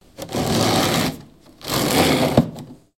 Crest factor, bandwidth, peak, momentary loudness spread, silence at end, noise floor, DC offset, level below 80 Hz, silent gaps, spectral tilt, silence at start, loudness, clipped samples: 20 dB; 17 kHz; 0 dBFS; 16 LU; 0.2 s; -43 dBFS; under 0.1%; -44 dBFS; none; -4.5 dB/octave; 0.2 s; -19 LUFS; under 0.1%